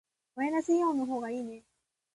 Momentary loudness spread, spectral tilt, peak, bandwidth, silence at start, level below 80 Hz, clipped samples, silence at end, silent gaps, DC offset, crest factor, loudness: 18 LU; -5 dB/octave; -18 dBFS; 11.5 kHz; 0.35 s; -76 dBFS; under 0.1%; 0.55 s; none; under 0.1%; 16 dB; -31 LUFS